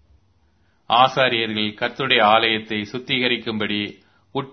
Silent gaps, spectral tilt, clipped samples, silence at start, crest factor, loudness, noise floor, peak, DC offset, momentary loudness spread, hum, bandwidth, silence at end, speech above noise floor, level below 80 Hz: none; -5 dB/octave; under 0.1%; 0.9 s; 20 dB; -19 LUFS; -62 dBFS; 0 dBFS; under 0.1%; 12 LU; none; 6.6 kHz; 0 s; 42 dB; -62 dBFS